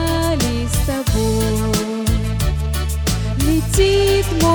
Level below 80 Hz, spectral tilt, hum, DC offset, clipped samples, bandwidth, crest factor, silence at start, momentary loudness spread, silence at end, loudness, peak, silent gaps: -24 dBFS; -5 dB/octave; none; under 0.1%; under 0.1%; over 20 kHz; 14 dB; 0 s; 5 LU; 0 s; -18 LUFS; -2 dBFS; none